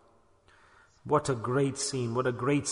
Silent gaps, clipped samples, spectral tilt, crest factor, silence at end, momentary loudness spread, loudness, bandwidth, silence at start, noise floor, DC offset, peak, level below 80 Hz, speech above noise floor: none; under 0.1%; -5 dB/octave; 18 dB; 0 s; 3 LU; -29 LUFS; 11 kHz; 1.05 s; -62 dBFS; under 0.1%; -12 dBFS; -62 dBFS; 34 dB